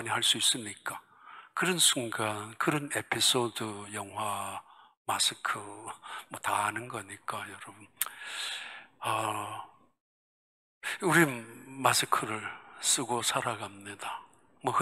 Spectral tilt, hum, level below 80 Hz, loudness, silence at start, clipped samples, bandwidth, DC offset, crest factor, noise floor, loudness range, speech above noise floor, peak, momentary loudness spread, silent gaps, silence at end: -2 dB/octave; none; -78 dBFS; -30 LUFS; 0 s; under 0.1%; 16 kHz; under 0.1%; 24 dB; -53 dBFS; 8 LU; 21 dB; -8 dBFS; 18 LU; 4.97-5.05 s, 10.00-10.81 s; 0 s